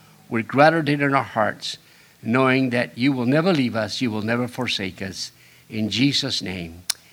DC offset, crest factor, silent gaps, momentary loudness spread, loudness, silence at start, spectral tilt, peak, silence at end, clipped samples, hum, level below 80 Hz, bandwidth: under 0.1%; 22 dB; none; 14 LU; -22 LUFS; 0.3 s; -5 dB/octave; 0 dBFS; 0.2 s; under 0.1%; none; -60 dBFS; over 20 kHz